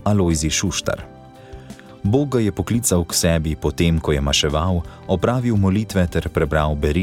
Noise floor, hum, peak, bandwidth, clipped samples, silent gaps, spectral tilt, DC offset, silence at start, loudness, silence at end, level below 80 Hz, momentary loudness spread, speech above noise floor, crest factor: -39 dBFS; none; -4 dBFS; 17.5 kHz; under 0.1%; none; -5 dB/octave; under 0.1%; 0 s; -19 LUFS; 0 s; -30 dBFS; 9 LU; 20 dB; 14 dB